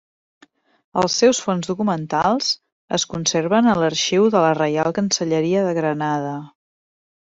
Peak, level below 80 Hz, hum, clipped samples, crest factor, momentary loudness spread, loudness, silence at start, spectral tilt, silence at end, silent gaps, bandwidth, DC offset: -4 dBFS; -58 dBFS; none; under 0.1%; 16 dB; 8 LU; -19 LUFS; 0.95 s; -4 dB/octave; 0.8 s; 2.72-2.88 s; 8 kHz; under 0.1%